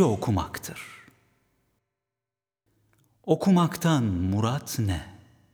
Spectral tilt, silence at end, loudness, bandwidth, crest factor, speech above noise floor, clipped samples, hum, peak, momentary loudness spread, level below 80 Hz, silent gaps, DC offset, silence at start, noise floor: -6.5 dB/octave; 0.4 s; -26 LUFS; over 20 kHz; 20 dB; over 65 dB; under 0.1%; 50 Hz at -55 dBFS; -6 dBFS; 19 LU; -52 dBFS; none; under 0.1%; 0 s; under -90 dBFS